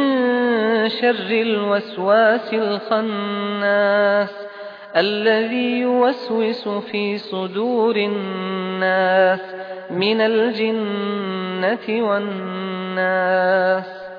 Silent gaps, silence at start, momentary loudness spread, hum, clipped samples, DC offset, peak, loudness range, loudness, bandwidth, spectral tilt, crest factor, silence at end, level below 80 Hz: none; 0 s; 9 LU; none; under 0.1%; under 0.1%; -2 dBFS; 2 LU; -19 LUFS; 5.2 kHz; -7.5 dB/octave; 18 dB; 0 s; -76 dBFS